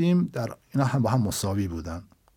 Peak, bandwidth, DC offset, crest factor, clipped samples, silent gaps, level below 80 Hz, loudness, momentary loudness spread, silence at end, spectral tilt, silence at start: -10 dBFS; 18.5 kHz; under 0.1%; 16 dB; under 0.1%; none; -52 dBFS; -26 LUFS; 12 LU; 0.35 s; -6.5 dB/octave; 0 s